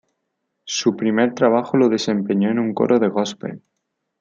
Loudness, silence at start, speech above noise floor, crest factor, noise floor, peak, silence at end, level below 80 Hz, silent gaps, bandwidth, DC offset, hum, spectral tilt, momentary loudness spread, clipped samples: -19 LUFS; 0.65 s; 57 dB; 18 dB; -75 dBFS; -2 dBFS; 0.65 s; -66 dBFS; none; 7.6 kHz; under 0.1%; none; -5 dB/octave; 9 LU; under 0.1%